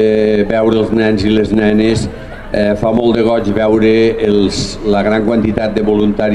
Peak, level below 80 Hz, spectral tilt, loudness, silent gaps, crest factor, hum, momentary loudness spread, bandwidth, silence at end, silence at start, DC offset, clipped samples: 0 dBFS; -30 dBFS; -6.5 dB/octave; -12 LUFS; none; 12 dB; none; 5 LU; 11 kHz; 0 s; 0 s; under 0.1%; under 0.1%